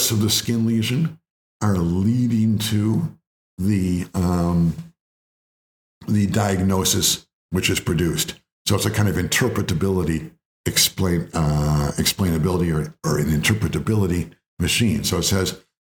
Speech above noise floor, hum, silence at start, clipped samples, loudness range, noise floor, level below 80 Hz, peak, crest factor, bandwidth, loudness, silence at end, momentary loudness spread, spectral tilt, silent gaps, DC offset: over 70 dB; none; 0 s; under 0.1%; 2 LU; under -90 dBFS; -42 dBFS; -4 dBFS; 16 dB; 20 kHz; -21 LUFS; 0.25 s; 8 LU; -4.5 dB/octave; 1.31-1.60 s, 3.27-3.57 s, 5.00-6.01 s, 7.33-7.49 s, 8.52-8.65 s, 10.45-10.64 s, 14.48-14.57 s; under 0.1%